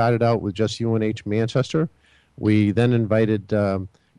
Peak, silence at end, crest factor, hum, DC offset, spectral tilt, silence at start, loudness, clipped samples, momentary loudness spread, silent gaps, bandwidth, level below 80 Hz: -6 dBFS; 0.3 s; 14 dB; none; under 0.1%; -7.5 dB/octave; 0 s; -22 LUFS; under 0.1%; 6 LU; none; 10.5 kHz; -54 dBFS